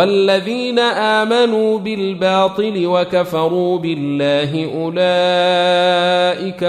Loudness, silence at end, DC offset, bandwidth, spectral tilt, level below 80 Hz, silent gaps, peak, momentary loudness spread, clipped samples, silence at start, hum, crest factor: -15 LUFS; 0 s; under 0.1%; 13.5 kHz; -5.5 dB/octave; -60 dBFS; none; -2 dBFS; 6 LU; under 0.1%; 0 s; none; 14 dB